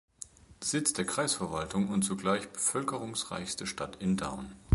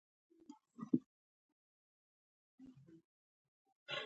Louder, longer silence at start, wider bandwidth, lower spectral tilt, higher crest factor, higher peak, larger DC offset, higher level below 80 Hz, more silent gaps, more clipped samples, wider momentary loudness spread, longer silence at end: first, -32 LUFS vs -43 LUFS; second, 0.2 s vs 0.5 s; first, 12 kHz vs 8 kHz; about the same, -4 dB/octave vs -4 dB/octave; second, 20 dB vs 30 dB; first, -12 dBFS vs -20 dBFS; neither; first, -58 dBFS vs under -90 dBFS; second, none vs 1.06-2.58 s, 3.04-3.65 s, 3.72-3.86 s; neither; second, 9 LU vs 23 LU; about the same, 0 s vs 0 s